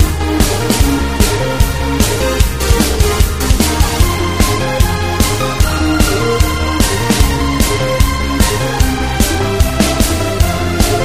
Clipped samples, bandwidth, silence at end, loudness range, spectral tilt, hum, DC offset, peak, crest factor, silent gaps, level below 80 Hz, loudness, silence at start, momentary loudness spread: under 0.1%; 16 kHz; 0 s; 0 LU; -4.5 dB/octave; none; 0.4%; 0 dBFS; 12 dB; none; -16 dBFS; -13 LUFS; 0 s; 2 LU